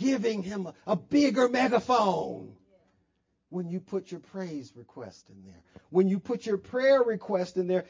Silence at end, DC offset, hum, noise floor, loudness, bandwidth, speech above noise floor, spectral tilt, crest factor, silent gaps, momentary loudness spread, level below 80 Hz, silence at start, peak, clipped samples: 0.05 s; under 0.1%; none; -75 dBFS; -28 LUFS; 7.6 kHz; 47 dB; -6 dB/octave; 18 dB; none; 18 LU; -68 dBFS; 0 s; -10 dBFS; under 0.1%